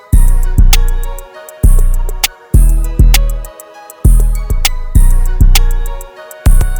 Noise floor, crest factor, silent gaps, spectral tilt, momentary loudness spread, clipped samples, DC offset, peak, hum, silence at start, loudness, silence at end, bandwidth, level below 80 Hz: -33 dBFS; 8 dB; none; -4 dB/octave; 17 LU; 2%; under 0.1%; 0 dBFS; none; 0.1 s; -13 LUFS; 0 s; over 20 kHz; -8 dBFS